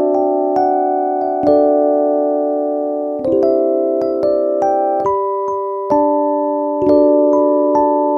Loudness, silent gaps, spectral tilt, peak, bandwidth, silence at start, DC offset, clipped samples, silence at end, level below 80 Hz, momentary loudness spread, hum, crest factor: -15 LUFS; none; -8.5 dB/octave; 0 dBFS; 6.6 kHz; 0 s; under 0.1%; under 0.1%; 0 s; -54 dBFS; 6 LU; none; 14 dB